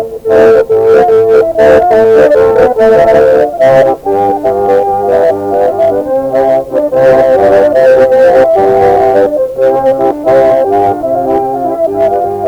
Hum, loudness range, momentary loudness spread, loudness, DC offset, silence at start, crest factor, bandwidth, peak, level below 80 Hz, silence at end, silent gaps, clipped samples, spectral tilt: none; 3 LU; 6 LU; -7 LUFS; under 0.1%; 0 s; 6 dB; 19 kHz; 0 dBFS; -38 dBFS; 0 s; none; 0.2%; -7 dB/octave